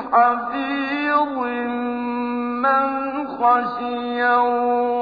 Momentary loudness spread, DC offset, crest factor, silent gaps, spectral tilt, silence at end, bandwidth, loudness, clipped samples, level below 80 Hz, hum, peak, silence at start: 7 LU; under 0.1%; 16 dB; none; -7 dB/octave; 0 s; 5 kHz; -20 LUFS; under 0.1%; -60 dBFS; none; -4 dBFS; 0 s